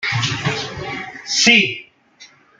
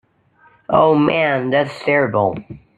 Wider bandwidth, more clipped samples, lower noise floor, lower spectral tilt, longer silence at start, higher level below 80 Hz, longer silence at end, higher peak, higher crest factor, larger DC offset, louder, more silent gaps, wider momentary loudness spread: first, 10.5 kHz vs 9.4 kHz; neither; second, -47 dBFS vs -54 dBFS; second, -2.5 dB/octave vs -7.5 dB/octave; second, 0 s vs 0.7 s; about the same, -54 dBFS vs -54 dBFS; first, 0.35 s vs 0.2 s; about the same, 0 dBFS vs -2 dBFS; about the same, 20 dB vs 16 dB; neither; about the same, -16 LUFS vs -16 LUFS; neither; first, 17 LU vs 6 LU